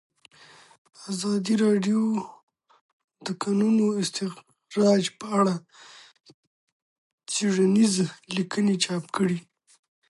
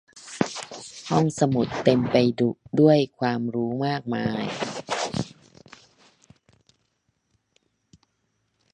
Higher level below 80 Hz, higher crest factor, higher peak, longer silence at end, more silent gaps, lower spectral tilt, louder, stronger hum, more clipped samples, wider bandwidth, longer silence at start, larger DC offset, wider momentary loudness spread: second, -74 dBFS vs -60 dBFS; second, 16 dB vs 24 dB; second, -10 dBFS vs -2 dBFS; second, 0.7 s vs 3.45 s; first, 2.43-2.48 s, 2.81-3.08 s, 6.34-7.18 s vs none; about the same, -5 dB/octave vs -6 dB/octave; about the same, -25 LUFS vs -24 LUFS; neither; neither; about the same, 11.5 kHz vs 10.5 kHz; first, 1 s vs 0.15 s; neither; about the same, 13 LU vs 13 LU